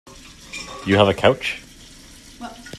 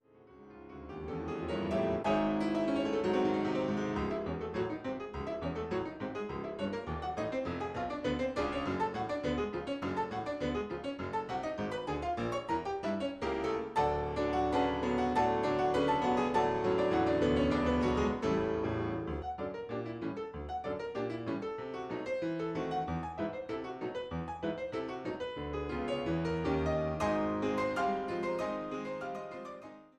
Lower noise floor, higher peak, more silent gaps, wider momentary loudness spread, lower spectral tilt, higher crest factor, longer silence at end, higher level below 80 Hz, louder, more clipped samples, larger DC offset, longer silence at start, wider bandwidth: second, -44 dBFS vs -57 dBFS; first, 0 dBFS vs -20 dBFS; neither; first, 21 LU vs 10 LU; second, -5 dB/octave vs -7 dB/octave; first, 22 dB vs 14 dB; second, 0 s vs 0.15 s; about the same, -50 dBFS vs -52 dBFS; first, -18 LUFS vs -34 LUFS; neither; neither; first, 0.5 s vs 0.2 s; first, 14 kHz vs 11 kHz